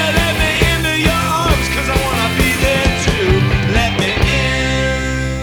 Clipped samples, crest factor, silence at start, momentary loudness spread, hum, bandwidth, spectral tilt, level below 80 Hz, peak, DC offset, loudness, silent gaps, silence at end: under 0.1%; 14 dB; 0 s; 2 LU; none; 20 kHz; -4.5 dB/octave; -22 dBFS; 0 dBFS; under 0.1%; -14 LUFS; none; 0 s